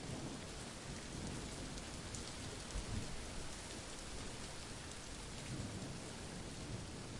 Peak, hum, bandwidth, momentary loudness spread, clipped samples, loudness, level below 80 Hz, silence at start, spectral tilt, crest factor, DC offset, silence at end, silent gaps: -30 dBFS; none; 11.5 kHz; 3 LU; under 0.1%; -47 LUFS; -54 dBFS; 0 s; -4 dB/octave; 18 dB; under 0.1%; 0 s; none